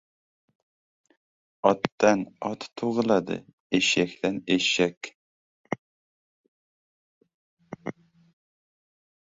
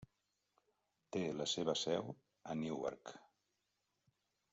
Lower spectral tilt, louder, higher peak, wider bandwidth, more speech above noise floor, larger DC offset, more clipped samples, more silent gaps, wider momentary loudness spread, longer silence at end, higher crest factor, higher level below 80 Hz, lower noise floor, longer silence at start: about the same, -4 dB/octave vs -4 dB/octave; first, -26 LUFS vs -41 LUFS; first, -4 dBFS vs -24 dBFS; about the same, 8 kHz vs 8 kHz; first, over 65 dB vs 45 dB; neither; neither; first, 1.92-1.98 s, 3.53-3.70 s, 4.97-5.01 s, 5.15-5.64 s, 5.79-7.21 s, 7.34-7.57 s vs none; about the same, 16 LU vs 17 LU; about the same, 1.45 s vs 1.35 s; first, 26 dB vs 20 dB; first, -66 dBFS vs -80 dBFS; first, under -90 dBFS vs -86 dBFS; first, 1.65 s vs 0 s